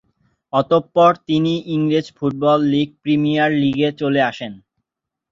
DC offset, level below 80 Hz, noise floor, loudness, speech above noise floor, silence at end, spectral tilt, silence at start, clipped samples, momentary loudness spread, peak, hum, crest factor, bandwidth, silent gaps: under 0.1%; -58 dBFS; -83 dBFS; -17 LUFS; 66 dB; 0.75 s; -7.5 dB/octave; 0.55 s; under 0.1%; 7 LU; -2 dBFS; none; 16 dB; 7.4 kHz; none